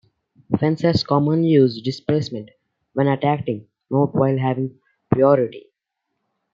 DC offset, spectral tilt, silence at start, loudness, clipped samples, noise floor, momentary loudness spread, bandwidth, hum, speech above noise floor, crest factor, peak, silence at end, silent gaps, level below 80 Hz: under 0.1%; -8.5 dB/octave; 0.5 s; -20 LUFS; under 0.1%; -78 dBFS; 12 LU; 7.4 kHz; none; 60 dB; 18 dB; -2 dBFS; 0.95 s; none; -56 dBFS